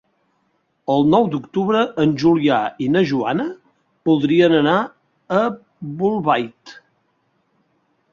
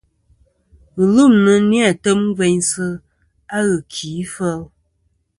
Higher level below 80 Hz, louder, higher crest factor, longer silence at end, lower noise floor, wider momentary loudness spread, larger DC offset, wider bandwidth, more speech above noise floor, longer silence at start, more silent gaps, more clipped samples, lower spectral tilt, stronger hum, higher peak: second, -58 dBFS vs -52 dBFS; about the same, -18 LUFS vs -16 LUFS; about the same, 16 dB vs 16 dB; first, 1.4 s vs 0.75 s; about the same, -66 dBFS vs -65 dBFS; about the same, 13 LU vs 15 LU; neither; second, 7.2 kHz vs 11.5 kHz; about the same, 49 dB vs 50 dB; about the same, 0.9 s vs 0.95 s; neither; neither; first, -7.5 dB/octave vs -5 dB/octave; neither; about the same, -2 dBFS vs 0 dBFS